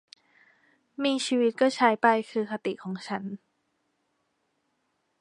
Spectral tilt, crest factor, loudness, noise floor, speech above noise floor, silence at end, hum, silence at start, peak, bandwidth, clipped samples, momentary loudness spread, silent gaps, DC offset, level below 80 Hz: -4.5 dB/octave; 22 dB; -26 LUFS; -75 dBFS; 49 dB; 1.85 s; none; 1 s; -6 dBFS; 11.5 kHz; under 0.1%; 15 LU; none; under 0.1%; -80 dBFS